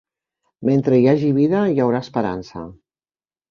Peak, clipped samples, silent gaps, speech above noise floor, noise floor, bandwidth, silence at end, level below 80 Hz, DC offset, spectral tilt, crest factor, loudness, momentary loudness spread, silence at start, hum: -4 dBFS; under 0.1%; none; over 73 dB; under -90 dBFS; 6.8 kHz; 0.8 s; -54 dBFS; under 0.1%; -9 dB/octave; 16 dB; -18 LUFS; 18 LU; 0.6 s; none